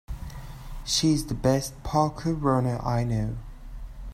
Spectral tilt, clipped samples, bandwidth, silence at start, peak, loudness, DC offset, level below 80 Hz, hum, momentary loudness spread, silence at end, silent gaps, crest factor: -5.5 dB/octave; under 0.1%; 15.5 kHz; 0.1 s; -8 dBFS; -26 LUFS; under 0.1%; -40 dBFS; none; 19 LU; 0 s; none; 18 dB